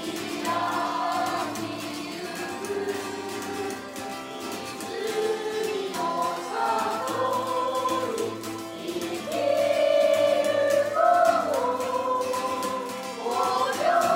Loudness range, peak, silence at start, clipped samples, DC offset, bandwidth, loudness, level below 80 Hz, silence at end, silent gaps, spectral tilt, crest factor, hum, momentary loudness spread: 8 LU; -8 dBFS; 0 s; under 0.1%; under 0.1%; 16 kHz; -26 LUFS; -68 dBFS; 0 s; none; -3.5 dB/octave; 18 dB; none; 12 LU